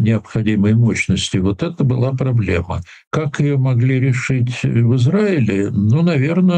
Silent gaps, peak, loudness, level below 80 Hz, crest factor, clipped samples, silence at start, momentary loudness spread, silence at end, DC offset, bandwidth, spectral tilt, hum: 3.07-3.11 s; -6 dBFS; -16 LUFS; -42 dBFS; 10 dB; under 0.1%; 0 s; 5 LU; 0 s; under 0.1%; 9.4 kHz; -7 dB/octave; none